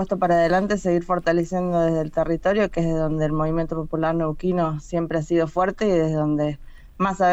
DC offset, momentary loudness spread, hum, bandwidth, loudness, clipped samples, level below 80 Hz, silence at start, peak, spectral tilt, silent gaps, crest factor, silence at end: under 0.1%; 5 LU; none; 8.2 kHz; -22 LUFS; under 0.1%; -40 dBFS; 0 s; -8 dBFS; -7.5 dB/octave; none; 12 dB; 0 s